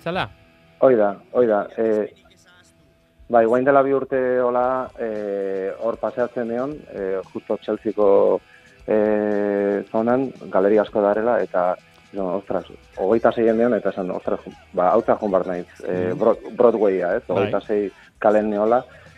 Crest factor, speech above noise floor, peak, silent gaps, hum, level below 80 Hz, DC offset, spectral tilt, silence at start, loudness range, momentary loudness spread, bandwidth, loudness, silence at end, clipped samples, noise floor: 20 dB; 37 dB; 0 dBFS; none; none; -56 dBFS; under 0.1%; -8 dB/octave; 0.05 s; 3 LU; 11 LU; 8 kHz; -21 LUFS; 0.3 s; under 0.1%; -57 dBFS